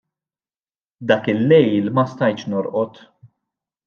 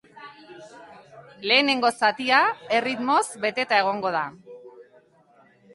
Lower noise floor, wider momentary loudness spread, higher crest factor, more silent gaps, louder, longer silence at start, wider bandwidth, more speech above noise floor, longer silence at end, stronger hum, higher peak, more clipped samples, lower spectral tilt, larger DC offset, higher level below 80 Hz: first, under -90 dBFS vs -58 dBFS; second, 10 LU vs 13 LU; about the same, 18 dB vs 20 dB; neither; first, -18 LUFS vs -22 LUFS; first, 1 s vs 0.15 s; second, 6.8 kHz vs 11.5 kHz; first, over 73 dB vs 35 dB; about the same, 1 s vs 0.95 s; neither; first, -2 dBFS vs -6 dBFS; neither; first, -8 dB/octave vs -2.5 dB/octave; neither; first, -68 dBFS vs -74 dBFS